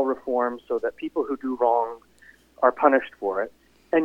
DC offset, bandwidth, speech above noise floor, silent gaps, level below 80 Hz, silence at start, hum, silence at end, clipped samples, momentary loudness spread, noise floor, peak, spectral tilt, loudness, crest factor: under 0.1%; 7.2 kHz; 31 dB; none; -64 dBFS; 0 s; none; 0 s; under 0.1%; 10 LU; -55 dBFS; -4 dBFS; -6.5 dB/octave; -25 LUFS; 20 dB